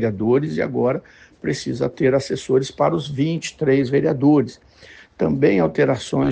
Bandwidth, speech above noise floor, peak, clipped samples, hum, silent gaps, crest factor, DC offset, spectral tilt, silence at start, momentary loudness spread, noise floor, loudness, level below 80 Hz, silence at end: 9.4 kHz; 27 dB; -4 dBFS; under 0.1%; none; none; 16 dB; under 0.1%; -6.5 dB/octave; 0 s; 8 LU; -46 dBFS; -20 LUFS; -52 dBFS; 0 s